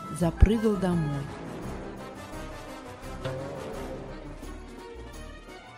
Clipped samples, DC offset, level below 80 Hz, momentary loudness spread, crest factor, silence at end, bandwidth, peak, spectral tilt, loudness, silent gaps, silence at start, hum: under 0.1%; under 0.1%; -36 dBFS; 19 LU; 26 dB; 0 s; 16 kHz; -4 dBFS; -7 dB/octave; -31 LUFS; none; 0 s; none